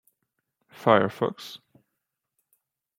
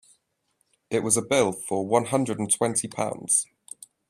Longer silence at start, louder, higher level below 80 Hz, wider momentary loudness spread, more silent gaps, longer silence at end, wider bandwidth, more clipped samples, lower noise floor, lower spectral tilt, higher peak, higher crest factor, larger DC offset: about the same, 0.8 s vs 0.9 s; about the same, -24 LUFS vs -24 LUFS; second, -74 dBFS vs -66 dBFS; first, 21 LU vs 8 LU; neither; first, 1.4 s vs 0.65 s; about the same, 16.5 kHz vs 15 kHz; neither; first, -82 dBFS vs -73 dBFS; first, -6.5 dB/octave vs -3.5 dB/octave; first, -2 dBFS vs -6 dBFS; first, 26 dB vs 20 dB; neither